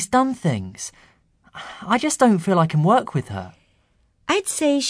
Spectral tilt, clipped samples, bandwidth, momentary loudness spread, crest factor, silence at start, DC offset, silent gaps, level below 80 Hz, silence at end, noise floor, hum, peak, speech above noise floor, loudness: -5 dB/octave; under 0.1%; 11 kHz; 18 LU; 18 dB; 0 s; under 0.1%; none; -58 dBFS; 0 s; -62 dBFS; none; -4 dBFS; 42 dB; -20 LUFS